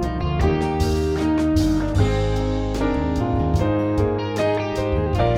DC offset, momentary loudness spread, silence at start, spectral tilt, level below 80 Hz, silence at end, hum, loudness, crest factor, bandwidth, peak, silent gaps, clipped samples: under 0.1%; 3 LU; 0 s; -7.5 dB/octave; -28 dBFS; 0 s; none; -21 LUFS; 14 dB; 15.5 kHz; -6 dBFS; none; under 0.1%